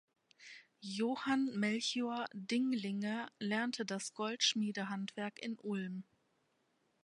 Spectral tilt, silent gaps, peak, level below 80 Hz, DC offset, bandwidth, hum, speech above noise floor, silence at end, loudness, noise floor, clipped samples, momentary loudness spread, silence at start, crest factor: -3.5 dB/octave; none; -18 dBFS; -86 dBFS; under 0.1%; 11.5 kHz; none; 41 dB; 1.05 s; -38 LUFS; -78 dBFS; under 0.1%; 12 LU; 0.4 s; 22 dB